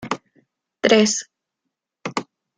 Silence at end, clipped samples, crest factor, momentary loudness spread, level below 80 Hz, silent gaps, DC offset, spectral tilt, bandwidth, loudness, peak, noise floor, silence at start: 0.35 s; under 0.1%; 22 dB; 15 LU; -64 dBFS; none; under 0.1%; -3 dB/octave; 9.6 kHz; -20 LUFS; -2 dBFS; -81 dBFS; 0 s